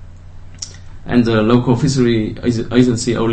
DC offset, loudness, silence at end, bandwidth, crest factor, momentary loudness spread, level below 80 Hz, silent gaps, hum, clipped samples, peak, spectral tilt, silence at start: under 0.1%; -15 LUFS; 0 s; 8.8 kHz; 16 dB; 17 LU; -36 dBFS; none; none; under 0.1%; 0 dBFS; -6.5 dB/octave; 0 s